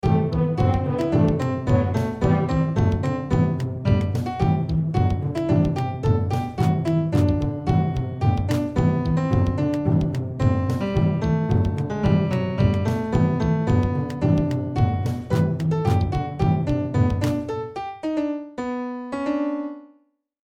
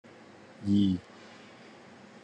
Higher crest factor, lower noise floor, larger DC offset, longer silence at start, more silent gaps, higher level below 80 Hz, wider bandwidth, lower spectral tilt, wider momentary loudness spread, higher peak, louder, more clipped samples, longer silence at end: about the same, 16 dB vs 18 dB; first, -63 dBFS vs -53 dBFS; neither; second, 0.05 s vs 0.6 s; neither; first, -36 dBFS vs -74 dBFS; first, 9.6 kHz vs 8.6 kHz; about the same, -8.5 dB/octave vs -7.5 dB/octave; second, 5 LU vs 26 LU; first, -6 dBFS vs -16 dBFS; first, -22 LUFS vs -29 LUFS; neither; second, 0.6 s vs 1.25 s